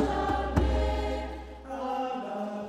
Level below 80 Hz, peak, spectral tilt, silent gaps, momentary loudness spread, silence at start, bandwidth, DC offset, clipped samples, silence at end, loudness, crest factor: -34 dBFS; -10 dBFS; -7 dB/octave; none; 11 LU; 0 s; 10 kHz; under 0.1%; under 0.1%; 0 s; -31 LUFS; 20 dB